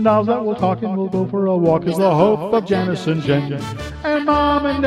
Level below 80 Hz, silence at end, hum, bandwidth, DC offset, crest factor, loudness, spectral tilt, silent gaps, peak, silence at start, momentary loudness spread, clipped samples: -40 dBFS; 0 s; none; 14 kHz; under 0.1%; 14 dB; -18 LUFS; -7.5 dB/octave; none; -2 dBFS; 0 s; 6 LU; under 0.1%